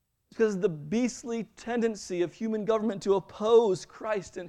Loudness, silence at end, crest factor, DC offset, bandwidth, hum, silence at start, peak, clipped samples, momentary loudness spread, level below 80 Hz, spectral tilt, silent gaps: -29 LUFS; 0 s; 18 dB; under 0.1%; 10.5 kHz; none; 0.35 s; -10 dBFS; under 0.1%; 11 LU; -64 dBFS; -5.5 dB/octave; none